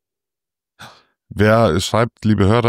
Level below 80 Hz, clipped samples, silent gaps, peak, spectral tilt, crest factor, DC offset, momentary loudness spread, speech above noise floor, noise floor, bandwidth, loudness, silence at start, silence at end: -44 dBFS; under 0.1%; none; -4 dBFS; -6 dB/octave; 14 dB; under 0.1%; 5 LU; 73 dB; -88 dBFS; 15 kHz; -16 LUFS; 0.8 s; 0 s